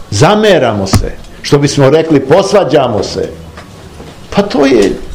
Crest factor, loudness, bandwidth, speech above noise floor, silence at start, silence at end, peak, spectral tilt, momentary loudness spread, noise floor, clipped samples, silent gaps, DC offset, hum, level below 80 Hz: 10 dB; -9 LUFS; 18.5 kHz; 22 dB; 0 s; 0 s; 0 dBFS; -5.5 dB/octave; 14 LU; -30 dBFS; 3%; none; under 0.1%; none; -28 dBFS